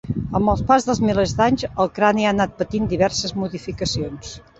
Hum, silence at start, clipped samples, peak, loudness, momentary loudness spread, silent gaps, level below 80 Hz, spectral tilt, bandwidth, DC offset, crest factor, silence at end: none; 0.05 s; under 0.1%; -2 dBFS; -20 LUFS; 9 LU; none; -38 dBFS; -5 dB/octave; 8.2 kHz; under 0.1%; 18 dB; 0.2 s